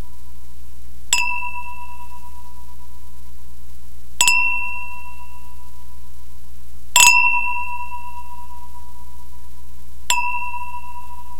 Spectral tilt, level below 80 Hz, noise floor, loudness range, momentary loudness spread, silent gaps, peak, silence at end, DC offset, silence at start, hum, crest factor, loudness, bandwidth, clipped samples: 1 dB/octave; -42 dBFS; -41 dBFS; 10 LU; 28 LU; none; 0 dBFS; 0 s; 10%; 0 s; none; 26 dB; -17 LUFS; 16 kHz; under 0.1%